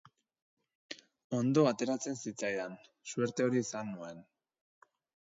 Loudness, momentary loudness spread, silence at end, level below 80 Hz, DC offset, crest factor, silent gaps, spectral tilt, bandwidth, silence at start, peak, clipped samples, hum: -34 LUFS; 20 LU; 1 s; -80 dBFS; under 0.1%; 22 dB; 1.24-1.30 s; -5.5 dB/octave; 7.8 kHz; 0.9 s; -14 dBFS; under 0.1%; none